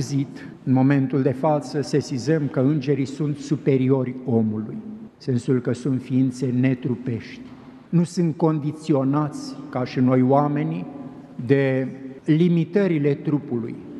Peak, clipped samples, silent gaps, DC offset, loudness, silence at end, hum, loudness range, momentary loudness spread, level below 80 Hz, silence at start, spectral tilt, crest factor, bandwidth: -4 dBFS; under 0.1%; none; under 0.1%; -22 LUFS; 0 s; none; 2 LU; 13 LU; -64 dBFS; 0 s; -8 dB/octave; 18 dB; 11 kHz